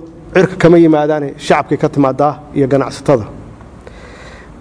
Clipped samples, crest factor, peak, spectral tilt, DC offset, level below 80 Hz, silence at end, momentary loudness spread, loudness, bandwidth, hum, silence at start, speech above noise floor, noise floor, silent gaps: 0.1%; 14 dB; 0 dBFS; -7 dB/octave; under 0.1%; -40 dBFS; 0.2 s; 9 LU; -12 LUFS; 10.5 kHz; none; 0 s; 23 dB; -34 dBFS; none